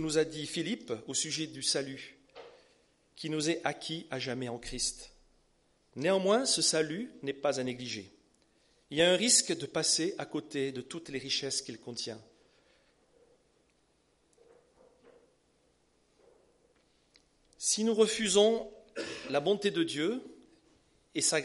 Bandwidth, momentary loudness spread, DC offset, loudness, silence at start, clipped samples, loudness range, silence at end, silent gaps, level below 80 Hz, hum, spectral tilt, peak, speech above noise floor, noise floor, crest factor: 11.5 kHz; 15 LU; under 0.1%; -31 LUFS; 0 s; under 0.1%; 9 LU; 0 s; none; -64 dBFS; 60 Hz at -70 dBFS; -2.5 dB/octave; -12 dBFS; 40 dB; -72 dBFS; 24 dB